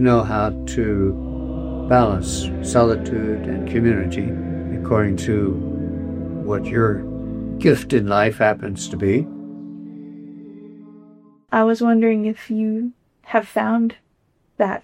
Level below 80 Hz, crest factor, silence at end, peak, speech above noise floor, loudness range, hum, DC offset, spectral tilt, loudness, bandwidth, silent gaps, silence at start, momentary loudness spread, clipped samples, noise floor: -36 dBFS; 18 dB; 0.05 s; -2 dBFS; 45 dB; 2 LU; none; under 0.1%; -6.5 dB/octave; -20 LUFS; 14.5 kHz; none; 0 s; 14 LU; under 0.1%; -64 dBFS